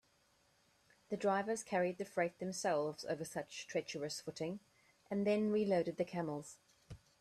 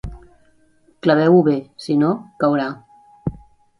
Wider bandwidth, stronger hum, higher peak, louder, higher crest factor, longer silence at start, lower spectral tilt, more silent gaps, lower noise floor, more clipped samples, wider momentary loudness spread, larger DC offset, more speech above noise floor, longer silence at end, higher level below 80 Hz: first, 13.5 kHz vs 11 kHz; neither; second, -22 dBFS vs -2 dBFS; second, -39 LUFS vs -18 LUFS; about the same, 18 dB vs 18 dB; first, 1.1 s vs 0.05 s; second, -5 dB/octave vs -8 dB/octave; neither; first, -74 dBFS vs -56 dBFS; neither; second, 12 LU vs 16 LU; neither; about the same, 36 dB vs 39 dB; second, 0.25 s vs 0.45 s; second, -76 dBFS vs -44 dBFS